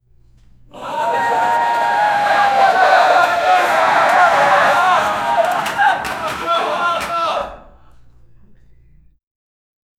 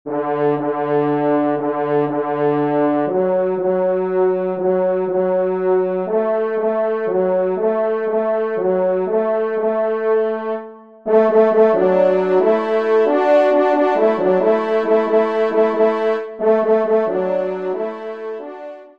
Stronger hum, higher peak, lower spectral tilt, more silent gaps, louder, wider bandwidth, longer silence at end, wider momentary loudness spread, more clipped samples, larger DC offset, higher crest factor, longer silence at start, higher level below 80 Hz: neither; about the same, 0 dBFS vs -2 dBFS; second, -2.5 dB/octave vs -8.5 dB/octave; neither; first, -14 LUFS vs -17 LUFS; first, 16 kHz vs 5.6 kHz; first, 2.4 s vs 0.1 s; about the same, 9 LU vs 7 LU; neither; second, under 0.1% vs 0.2%; about the same, 16 dB vs 14 dB; first, 0.75 s vs 0.05 s; first, -52 dBFS vs -68 dBFS